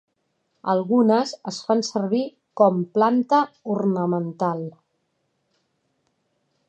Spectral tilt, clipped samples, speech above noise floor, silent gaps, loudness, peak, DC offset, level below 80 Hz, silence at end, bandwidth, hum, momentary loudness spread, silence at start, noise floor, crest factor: -6.5 dB/octave; under 0.1%; 51 dB; none; -22 LUFS; -4 dBFS; under 0.1%; -76 dBFS; 2 s; 8.8 kHz; none; 12 LU; 0.65 s; -72 dBFS; 20 dB